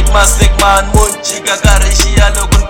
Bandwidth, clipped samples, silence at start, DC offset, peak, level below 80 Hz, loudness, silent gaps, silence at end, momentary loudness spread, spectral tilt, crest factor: 17.5 kHz; 2%; 0 s; under 0.1%; 0 dBFS; -10 dBFS; -9 LUFS; none; 0 s; 5 LU; -3.5 dB/octave; 8 dB